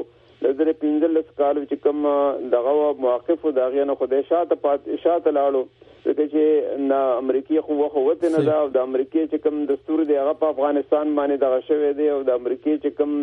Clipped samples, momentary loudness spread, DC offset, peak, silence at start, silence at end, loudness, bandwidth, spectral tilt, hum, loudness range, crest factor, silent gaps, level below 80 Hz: under 0.1%; 4 LU; under 0.1%; -6 dBFS; 0 s; 0 s; -21 LUFS; 4.4 kHz; -8 dB/octave; none; 1 LU; 14 dB; none; -64 dBFS